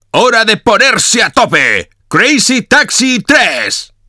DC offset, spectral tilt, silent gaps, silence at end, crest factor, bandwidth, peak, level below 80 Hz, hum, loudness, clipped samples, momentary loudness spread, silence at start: under 0.1%; -2 dB/octave; none; 0.25 s; 10 dB; 11 kHz; 0 dBFS; -44 dBFS; none; -8 LUFS; 2%; 5 LU; 0.15 s